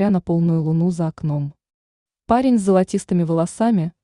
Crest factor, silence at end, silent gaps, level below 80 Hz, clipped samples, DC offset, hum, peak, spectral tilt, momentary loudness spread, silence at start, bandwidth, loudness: 14 dB; 0.15 s; 1.74-2.06 s; -50 dBFS; under 0.1%; under 0.1%; none; -4 dBFS; -8 dB/octave; 8 LU; 0 s; 11 kHz; -19 LUFS